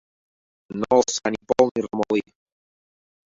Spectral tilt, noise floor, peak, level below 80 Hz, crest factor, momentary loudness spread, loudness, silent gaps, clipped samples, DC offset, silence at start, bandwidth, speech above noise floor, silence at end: -4 dB/octave; under -90 dBFS; -2 dBFS; -60 dBFS; 22 dB; 8 LU; -22 LUFS; 1.71-1.75 s; under 0.1%; under 0.1%; 0.7 s; 7.8 kHz; over 69 dB; 1.05 s